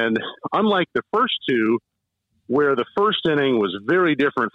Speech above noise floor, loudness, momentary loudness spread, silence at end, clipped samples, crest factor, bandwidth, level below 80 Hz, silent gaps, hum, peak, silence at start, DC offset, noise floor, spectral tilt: 52 dB; -20 LUFS; 4 LU; 0.05 s; under 0.1%; 12 dB; 6.4 kHz; -64 dBFS; none; none; -8 dBFS; 0 s; under 0.1%; -72 dBFS; -7 dB/octave